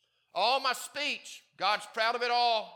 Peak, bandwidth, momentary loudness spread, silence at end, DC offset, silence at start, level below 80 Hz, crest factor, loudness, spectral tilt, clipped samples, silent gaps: -14 dBFS; 18.5 kHz; 10 LU; 0 s; under 0.1%; 0.35 s; under -90 dBFS; 18 dB; -30 LUFS; -0.5 dB/octave; under 0.1%; none